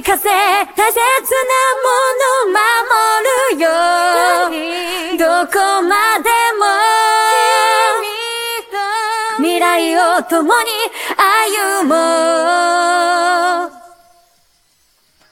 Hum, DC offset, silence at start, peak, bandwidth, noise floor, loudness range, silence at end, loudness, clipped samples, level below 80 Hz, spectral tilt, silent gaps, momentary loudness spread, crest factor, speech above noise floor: none; under 0.1%; 0 s; 0 dBFS; 17 kHz; -57 dBFS; 2 LU; 1.45 s; -13 LUFS; under 0.1%; -56 dBFS; 0 dB/octave; none; 7 LU; 14 dB; 44 dB